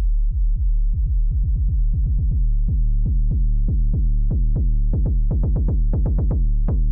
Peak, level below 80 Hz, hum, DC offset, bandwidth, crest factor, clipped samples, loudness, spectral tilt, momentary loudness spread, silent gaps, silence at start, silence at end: -12 dBFS; -18 dBFS; none; under 0.1%; 1.3 kHz; 4 dB; under 0.1%; -22 LUFS; -15 dB/octave; 2 LU; none; 0 s; 0 s